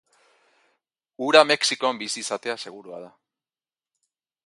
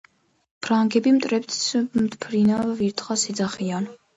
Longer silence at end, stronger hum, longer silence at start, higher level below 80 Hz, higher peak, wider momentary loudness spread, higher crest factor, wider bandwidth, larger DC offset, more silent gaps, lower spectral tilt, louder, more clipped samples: first, 1.35 s vs 0.2 s; neither; first, 1.2 s vs 0.6 s; second, -80 dBFS vs -62 dBFS; first, 0 dBFS vs -8 dBFS; first, 23 LU vs 7 LU; first, 26 dB vs 16 dB; first, 11.5 kHz vs 8 kHz; neither; neither; second, -1.5 dB/octave vs -4.5 dB/octave; about the same, -21 LUFS vs -22 LUFS; neither